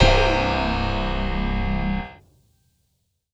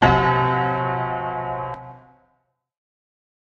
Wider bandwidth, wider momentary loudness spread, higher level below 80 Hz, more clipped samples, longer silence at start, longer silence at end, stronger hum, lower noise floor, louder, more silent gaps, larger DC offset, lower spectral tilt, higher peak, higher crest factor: first, 8 kHz vs 7 kHz; second, 9 LU vs 16 LU; first, -28 dBFS vs -40 dBFS; neither; about the same, 0 s vs 0 s; second, 1.2 s vs 1.5 s; neither; about the same, -71 dBFS vs -69 dBFS; about the same, -23 LUFS vs -22 LUFS; neither; neither; second, -6 dB/octave vs -7.5 dB/octave; about the same, -2 dBFS vs -2 dBFS; about the same, 20 dB vs 22 dB